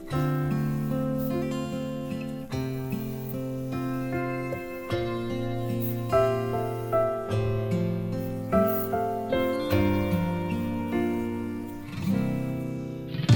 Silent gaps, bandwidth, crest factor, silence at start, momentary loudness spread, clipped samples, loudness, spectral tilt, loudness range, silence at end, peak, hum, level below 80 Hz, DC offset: none; 19.5 kHz; 20 dB; 0 s; 8 LU; under 0.1%; -29 LUFS; -7.5 dB/octave; 5 LU; 0 s; -8 dBFS; none; -48 dBFS; under 0.1%